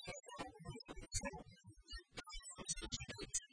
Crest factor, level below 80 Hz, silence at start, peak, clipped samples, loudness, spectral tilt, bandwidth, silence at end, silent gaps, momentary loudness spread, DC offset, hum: 22 dB; -58 dBFS; 0 s; -28 dBFS; under 0.1%; -48 LUFS; -2 dB/octave; 10.5 kHz; 0.05 s; none; 11 LU; under 0.1%; none